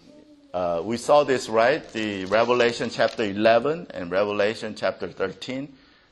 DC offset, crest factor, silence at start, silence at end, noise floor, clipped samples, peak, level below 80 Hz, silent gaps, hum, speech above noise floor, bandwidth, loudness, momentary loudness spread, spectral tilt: under 0.1%; 20 dB; 0.55 s; 0.4 s; -51 dBFS; under 0.1%; -4 dBFS; -60 dBFS; none; none; 28 dB; 12 kHz; -23 LUFS; 11 LU; -4.5 dB/octave